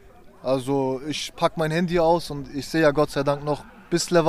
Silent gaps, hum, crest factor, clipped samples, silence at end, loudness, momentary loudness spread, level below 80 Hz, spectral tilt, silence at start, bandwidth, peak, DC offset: none; none; 18 dB; under 0.1%; 0 s; -24 LUFS; 10 LU; -46 dBFS; -5 dB/octave; 0.25 s; 15 kHz; -6 dBFS; under 0.1%